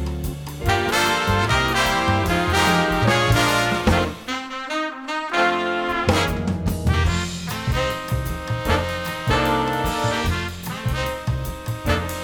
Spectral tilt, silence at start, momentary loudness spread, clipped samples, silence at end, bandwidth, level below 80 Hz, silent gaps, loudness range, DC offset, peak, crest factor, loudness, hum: -4.5 dB/octave; 0 s; 9 LU; under 0.1%; 0 s; over 20 kHz; -32 dBFS; none; 5 LU; under 0.1%; -2 dBFS; 18 dB; -21 LUFS; none